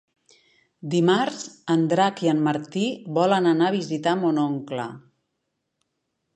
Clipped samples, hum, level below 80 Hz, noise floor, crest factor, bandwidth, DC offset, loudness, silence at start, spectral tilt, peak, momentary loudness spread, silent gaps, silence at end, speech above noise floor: under 0.1%; none; -76 dBFS; -78 dBFS; 18 dB; 9.6 kHz; under 0.1%; -23 LUFS; 0.85 s; -6 dB/octave; -6 dBFS; 11 LU; none; 1.35 s; 56 dB